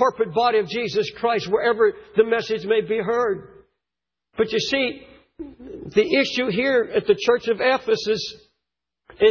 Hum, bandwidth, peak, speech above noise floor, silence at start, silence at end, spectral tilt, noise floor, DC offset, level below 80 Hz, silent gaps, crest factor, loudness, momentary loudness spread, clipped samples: none; 7 kHz; -4 dBFS; 66 dB; 0 s; 0 s; -4.5 dB/octave; -87 dBFS; under 0.1%; -58 dBFS; none; 18 dB; -21 LUFS; 12 LU; under 0.1%